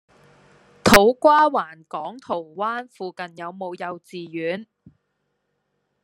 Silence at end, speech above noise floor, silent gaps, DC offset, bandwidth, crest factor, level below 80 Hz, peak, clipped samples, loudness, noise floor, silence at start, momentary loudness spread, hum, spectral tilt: 1.4 s; 51 dB; none; under 0.1%; 13 kHz; 22 dB; -46 dBFS; 0 dBFS; under 0.1%; -19 LUFS; -74 dBFS; 0.85 s; 19 LU; none; -4 dB/octave